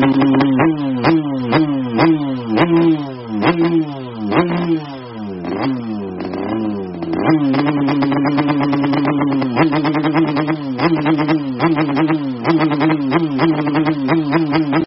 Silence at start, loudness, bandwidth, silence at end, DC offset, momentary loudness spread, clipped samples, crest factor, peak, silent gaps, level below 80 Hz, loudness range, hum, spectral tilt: 0 s; -16 LUFS; 5.8 kHz; 0 s; under 0.1%; 8 LU; under 0.1%; 16 dB; 0 dBFS; none; -50 dBFS; 4 LU; none; -6 dB/octave